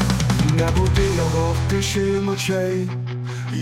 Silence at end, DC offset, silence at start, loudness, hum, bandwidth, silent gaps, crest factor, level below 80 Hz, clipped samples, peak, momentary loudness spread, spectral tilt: 0 s; under 0.1%; 0 s; -20 LUFS; none; 16 kHz; none; 14 dB; -30 dBFS; under 0.1%; -6 dBFS; 8 LU; -5.5 dB/octave